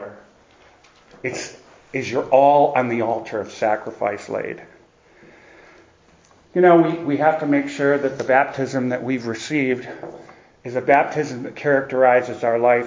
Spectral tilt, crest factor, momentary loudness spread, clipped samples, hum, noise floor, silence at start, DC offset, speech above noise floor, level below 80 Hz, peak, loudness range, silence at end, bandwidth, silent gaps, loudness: -6 dB/octave; 20 dB; 16 LU; under 0.1%; none; -53 dBFS; 0 s; under 0.1%; 34 dB; -62 dBFS; 0 dBFS; 6 LU; 0 s; 7.6 kHz; none; -19 LUFS